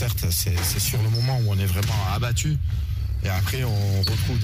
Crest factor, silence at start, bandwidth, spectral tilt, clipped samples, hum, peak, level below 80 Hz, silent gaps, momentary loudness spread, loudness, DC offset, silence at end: 12 dB; 0 s; 16 kHz; -4.5 dB/octave; under 0.1%; none; -12 dBFS; -32 dBFS; none; 4 LU; -23 LUFS; under 0.1%; 0 s